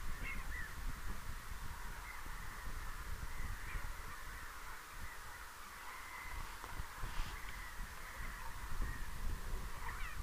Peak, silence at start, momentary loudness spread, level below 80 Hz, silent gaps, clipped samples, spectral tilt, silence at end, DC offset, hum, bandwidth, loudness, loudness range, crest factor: -28 dBFS; 0 s; 4 LU; -46 dBFS; none; under 0.1%; -3.5 dB/octave; 0 s; under 0.1%; none; 15.5 kHz; -48 LUFS; 1 LU; 16 dB